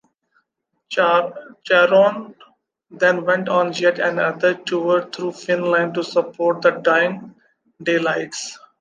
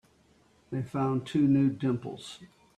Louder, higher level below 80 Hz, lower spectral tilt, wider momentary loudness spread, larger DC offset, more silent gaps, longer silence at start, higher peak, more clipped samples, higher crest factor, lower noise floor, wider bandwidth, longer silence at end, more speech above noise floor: first, -18 LUFS vs -29 LUFS; second, -74 dBFS vs -64 dBFS; second, -4.5 dB/octave vs -8 dB/octave; second, 12 LU vs 19 LU; neither; neither; first, 0.9 s vs 0.7 s; first, -2 dBFS vs -16 dBFS; neither; about the same, 18 dB vs 14 dB; first, -74 dBFS vs -64 dBFS; about the same, 9.4 kHz vs 10 kHz; about the same, 0.25 s vs 0.3 s; first, 55 dB vs 35 dB